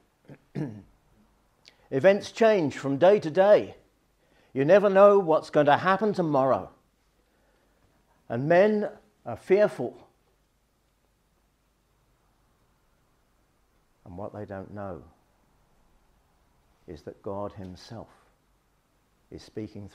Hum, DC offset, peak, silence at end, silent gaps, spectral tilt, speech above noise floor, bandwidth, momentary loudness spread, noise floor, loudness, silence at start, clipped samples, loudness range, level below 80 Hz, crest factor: none; under 0.1%; -4 dBFS; 0.05 s; none; -7 dB/octave; 46 dB; 9.8 kHz; 23 LU; -69 dBFS; -23 LUFS; 0.3 s; under 0.1%; 22 LU; -68 dBFS; 22 dB